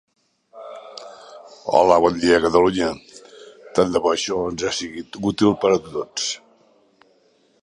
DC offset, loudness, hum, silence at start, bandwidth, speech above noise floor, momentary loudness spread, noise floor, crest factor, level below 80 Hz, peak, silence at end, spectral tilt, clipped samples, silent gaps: under 0.1%; -19 LUFS; none; 0.55 s; 11 kHz; 41 dB; 22 LU; -60 dBFS; 20 dB; -52 dBFS; 0 dBFS; 1.25 s; -4 dB/octave; under 0.1%; none